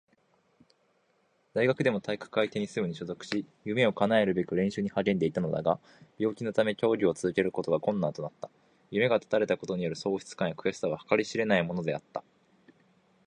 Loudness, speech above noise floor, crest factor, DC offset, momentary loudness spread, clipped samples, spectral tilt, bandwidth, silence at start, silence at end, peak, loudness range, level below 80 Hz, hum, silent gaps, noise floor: -30 LUFS; 41 dB; 22 dB; under 0.1%; 9 LU; under 0.1%; -6 dB/octave; 10.5 kHz; 1.55 s; 1.05 s; -8 dBFS; 3 LU; -66 dBFS; none; none; -71 dBFS